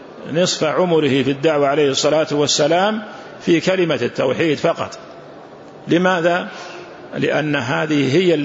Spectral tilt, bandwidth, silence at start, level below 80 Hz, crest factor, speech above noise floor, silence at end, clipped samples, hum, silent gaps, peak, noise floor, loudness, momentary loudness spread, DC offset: -4.5 dB/octave; 8 kHz; 0 s; -60 dBFS; 14 dB; 21 dB; 0 s; under 0.1%; none; none; -4 dBFS; -38 dBFS; -17 LUFS; 16 LU; under 0.1%